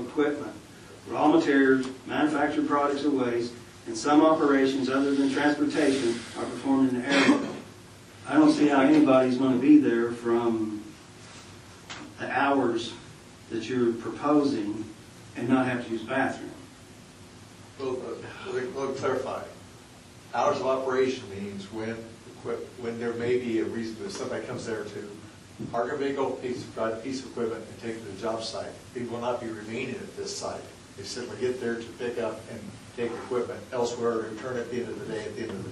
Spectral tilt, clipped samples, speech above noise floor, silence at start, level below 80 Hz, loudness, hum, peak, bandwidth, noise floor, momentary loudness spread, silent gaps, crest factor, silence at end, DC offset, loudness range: -5 dB/octave; under 0.1%; 23 dB; 0 s; -64 dBFS; -27 LUFS; none; -8 dBFS; 12 kHz; -49 dBFS; 20 LU; none; 20 dB; 0 s; under 0.1%; 11 LU